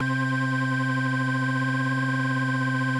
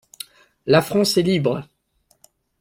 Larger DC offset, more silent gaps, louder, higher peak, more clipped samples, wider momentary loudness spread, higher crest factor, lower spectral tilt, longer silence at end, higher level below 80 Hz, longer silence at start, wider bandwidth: neither; neither; second, -25 LUFS vs -19 LUFS; second, -16 dBFS vs -2 dBFS; neither; second, 0 LU vs 20 LU; second, 8 dB vs 20 dB; first, -6.5 dB/octave vs -5 dB/octave; second, 0 s vs 0.95 s; second, -86 dBFS vs -56 dBFS; second, 0 s vs 0.65 s; second, 11 kHz vs 16.5 kHz